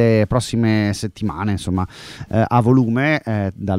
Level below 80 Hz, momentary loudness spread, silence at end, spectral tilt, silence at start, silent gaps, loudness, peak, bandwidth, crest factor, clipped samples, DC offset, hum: -42 dBFS; 9 LU; 0 s; -7 dB/octave; 0 s; none; -18 LUFS; -2 dBFS; 13.5 kHz; 16 dB; under 0.1%; under 0.1%; none